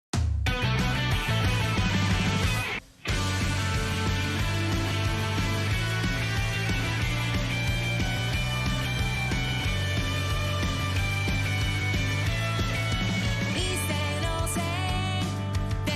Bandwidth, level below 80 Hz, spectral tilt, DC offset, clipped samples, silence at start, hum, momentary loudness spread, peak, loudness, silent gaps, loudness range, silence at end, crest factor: 15 kHz; -36 dBFS; -4.5 dB/octave; under 0.1%; under 0.1%; 0.15 s; none; 3 LU; -14 dBFS; -27 LUFS; none; 1 LU; 0 s; 12 dB